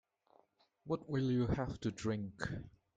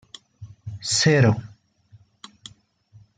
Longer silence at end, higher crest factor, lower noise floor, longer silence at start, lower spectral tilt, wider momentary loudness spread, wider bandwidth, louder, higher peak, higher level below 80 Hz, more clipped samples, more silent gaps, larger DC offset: second, 0.25 s vs 1.7 s; about the same, 18 dB vs 20 dB; first, -73 dBFS vs -55 dBFS; first, 0.85 s vs 0.4 s; first, -7 dB/octave vs -4.5 dB/octave; second, 9 LU vs 27 LU; about the same, 9.2 kHz vs 9.6 kHz; second, -39 LUFS vs -20 LUFS; second, -22 dBFS vs -6 dBFS; about the same, -58 dBFS vs -60 dBFS; neither; neither; neither